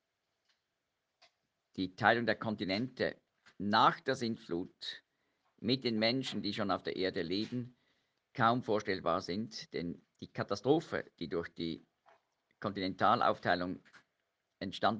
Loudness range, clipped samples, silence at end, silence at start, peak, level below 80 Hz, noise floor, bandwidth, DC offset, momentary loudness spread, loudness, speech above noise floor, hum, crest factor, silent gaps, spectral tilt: 4 LU; under 0.1%; 0 s; 1.75 s; -12 dBFS; -72 dBFS; -86 dBFS; 9.4 kHz; under 0.1%; 14 LU; -35 LUFS; 51 dB; none; 24 dB; none; -5.5 dB/octave